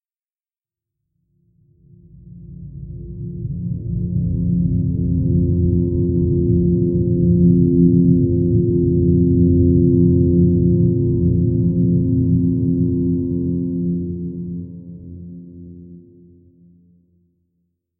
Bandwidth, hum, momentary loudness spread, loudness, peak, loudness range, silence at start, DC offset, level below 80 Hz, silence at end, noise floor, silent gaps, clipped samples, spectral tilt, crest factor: 1 kHz; none; 20 LU; -17 LUFS; -2 dBFS; 16 LU; 2.25 s; under 0.1%; -32 dBFS; 2 s; under -90 dBFS; none; under 0.1%; -19 dB/octave; 14 dB